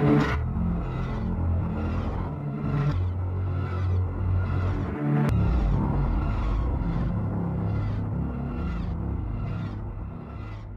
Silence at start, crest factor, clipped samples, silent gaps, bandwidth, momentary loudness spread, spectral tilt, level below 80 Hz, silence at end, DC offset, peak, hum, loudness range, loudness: 0 s; 16 dB; under 0.1%; none; 7 kHz; 7 LU; -9.5 dB/octave; -32 dBFS; 0 s; under 0.1%; -10 dBFS; none; 4 LU; -28 LUFS